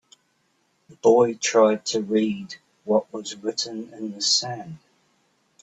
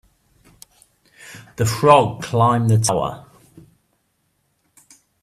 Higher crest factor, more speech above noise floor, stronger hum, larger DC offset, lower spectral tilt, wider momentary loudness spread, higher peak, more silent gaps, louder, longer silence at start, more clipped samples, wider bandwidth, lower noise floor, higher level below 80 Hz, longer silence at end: about the same, 20 dB vs 20 dB; second, 46 dB vs 51 dB; neither; neither; second, -3 dB/octave vs -5.5 dB/octave; second, 16 LU vs 26 LU; second, -4 dBFS vs 0 dBFS; neither; second, -22 LUFS vs -17 LUFS; second, 0.9 s vs 1.25 s; neither; second, 8.4 kHz vs 15 kHz; about the same, -68 dBFS vs -68 dBFS; second, -70 dBFS vs -52 dBFS; second, 0.85 s vs 2 s